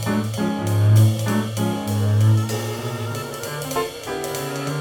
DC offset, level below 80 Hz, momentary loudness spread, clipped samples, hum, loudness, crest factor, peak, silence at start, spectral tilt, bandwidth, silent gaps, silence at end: under 0.1%; -54 dBFS; 11 LU; under 0.1%; none; -21 LUFS; 16 dB; -4 dBFS; 0 s; -6 dB/octave; 18 kHz; none; 0 s